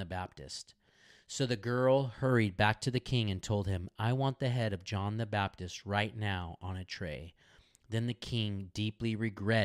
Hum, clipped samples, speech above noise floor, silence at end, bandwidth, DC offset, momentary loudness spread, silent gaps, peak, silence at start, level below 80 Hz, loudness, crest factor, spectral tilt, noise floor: none; under 0.1%; 30 dB; 0 s; 12.5 kHz; under 0.1%; 13 LU; none; -12 dBFS; 0 s; -58 dBFS; -34 LUFS; 22 dB; -6 dB/octave; -63 dBFS